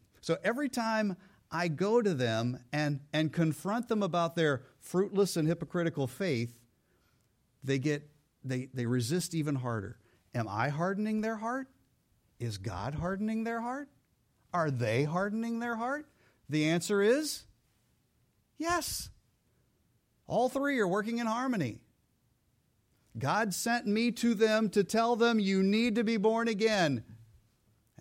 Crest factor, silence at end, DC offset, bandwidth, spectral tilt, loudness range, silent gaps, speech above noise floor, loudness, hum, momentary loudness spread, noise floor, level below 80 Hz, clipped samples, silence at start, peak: 18 dB; 0.75 s; under 0.1%; 16.5 kHz; -5.5 dB/octave; 7 LU; none; 42 dB; -32 LUFS; none; 11 LU; -73 dBFS; -64 dBFS; under 0.1%; 0.25 s; -14 dBFS